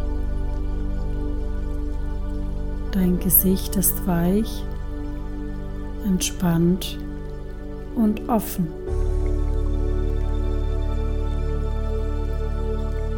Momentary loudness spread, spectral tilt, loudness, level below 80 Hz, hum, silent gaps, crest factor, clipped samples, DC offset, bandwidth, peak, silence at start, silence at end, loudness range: 12 LU; -5.5 dB/octave; -25 LUFS; -26 dBFS; none; none; 20 dB; under 0.1%; under 0.1%; 18 kHz; -2 dBFS; 0 s; 0 s; 5 LU